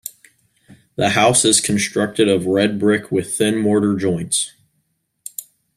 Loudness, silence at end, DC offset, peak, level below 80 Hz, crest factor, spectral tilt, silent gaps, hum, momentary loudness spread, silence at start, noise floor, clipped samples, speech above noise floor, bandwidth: -17 LUFS; 0.35 s; under 0.1%; 0 dBFS; -56 dBFS; 18 dB; -3.5 dB/octave; none; none; 19 LU; 0.05 s; -69 dBFS; under 0.1%; 52 dB; 15.5 kHz